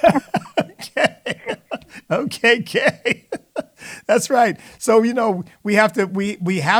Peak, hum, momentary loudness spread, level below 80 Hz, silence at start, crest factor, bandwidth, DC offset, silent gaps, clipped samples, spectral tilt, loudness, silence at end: 0 dBFS; none; 13 LU; -58 dBFS; 0 s; 18 dB; 18.5 kHz; under 0.1%; none; under 0.1%; -4.5 dB/octave; -19 LUFS; 0 s